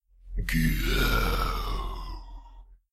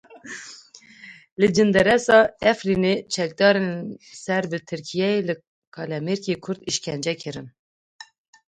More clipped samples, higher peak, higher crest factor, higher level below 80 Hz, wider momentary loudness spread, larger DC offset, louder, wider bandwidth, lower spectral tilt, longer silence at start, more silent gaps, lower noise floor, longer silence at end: neither; second, -12 dBFS vs -2 dBFS; about the same, 16 dB vs 20 dB; first, -30 dBFS vs -56 dBFS; about the same, 18 LU vs 19 LU; neither; second, -28 LUFS vs -22 LUFS; first, 15.5 kHz vs 11 kHz; about the same, -5 dB/octave vs -4.5 dB/octave; first, 0.25 s vs 0.1 s; second, none vs 1.32-1.37 s, 5.47-5.72 s, 7.59-7.99 s; about the same, -50 dBFS vs -48 dBFS; second, 0.2 s vs 0.45 s